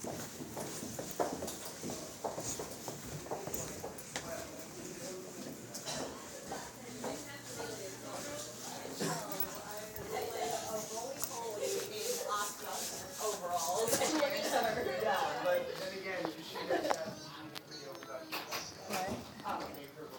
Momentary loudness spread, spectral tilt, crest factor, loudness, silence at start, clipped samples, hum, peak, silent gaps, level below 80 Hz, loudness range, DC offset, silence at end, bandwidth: 11 LU; -2.5 dB/octave; 26 dB; -39 LUFS; 0 s; under 0.1%; none; -14 dBFS; none; -68 dBFS; 9 LU; under 0.1%; 0 s; over 20 kHz